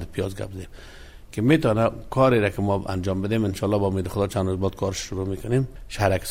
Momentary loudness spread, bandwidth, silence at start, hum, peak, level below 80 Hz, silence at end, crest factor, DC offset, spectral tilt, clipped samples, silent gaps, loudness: 12 LU; 16 kHz; 0 s; none; -6 dBFS; -42 dBFS; 0 s; 18 dB; under 0.1%; -6.5 dB/octave; under 0.1%; none; -24 LUFS